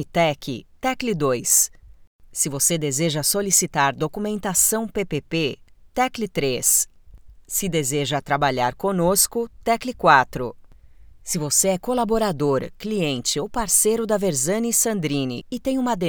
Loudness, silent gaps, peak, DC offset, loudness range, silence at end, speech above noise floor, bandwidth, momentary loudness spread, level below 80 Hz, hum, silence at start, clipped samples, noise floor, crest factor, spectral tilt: -21 LUFS; 2.07-2.19 s; 0 dBFS; under 0.1%; 2 LU; 0 s; 24 dB; over 20 kHz; 10 LU; -46 dBFS; none; 0 s; under 0.1%; -46 dBFS; 22 dB; -3 dB/octave